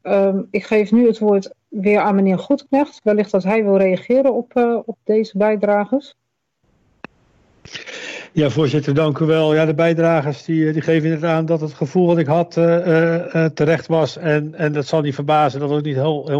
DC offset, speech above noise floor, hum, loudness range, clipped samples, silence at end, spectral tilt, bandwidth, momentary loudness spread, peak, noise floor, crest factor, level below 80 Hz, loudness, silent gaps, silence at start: under 0.1%; 50 dB; none; 5 LU; under 0.1%; 0 s; -7.5 dB/octave; 7.8 kHz; 6 LU; -6 dBFS; -67 dBFS; 12 dB; -60 dBFS; -17 LUFS; none; 0.05 s